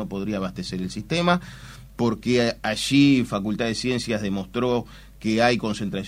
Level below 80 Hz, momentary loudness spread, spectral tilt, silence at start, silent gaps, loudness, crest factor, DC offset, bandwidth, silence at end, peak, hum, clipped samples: -48 dBFS; 12 LU; -5.5 dB/octave; 0 s; none; -23 LUFS; 20 dB; under 0.1%; 16 kHz; 0 s; -4 dBFS; none; under 0.1%